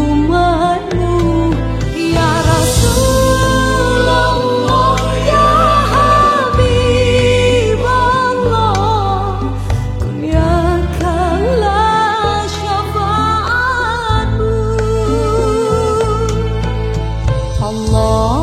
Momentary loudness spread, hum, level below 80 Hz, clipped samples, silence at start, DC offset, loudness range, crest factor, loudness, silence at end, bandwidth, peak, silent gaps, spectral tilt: 7 LU; none; -20 dBFS; under 0.1%; 0 s; under 0.1%; 4 LU; 12 dB; -13 LUFS; 0 s; 15.5 kHz; 0 dBFS; none; -5.5 dB/octave